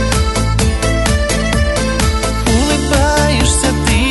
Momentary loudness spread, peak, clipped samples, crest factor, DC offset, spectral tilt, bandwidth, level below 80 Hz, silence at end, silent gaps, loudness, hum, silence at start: 3 LU; 0 dBFS; under 0.1%; 12 dB; under 0.1%; -4.5 dB/octave; 12 kHz; -18 dBFS; 0 s; none; -14 LUFS; none; 0 s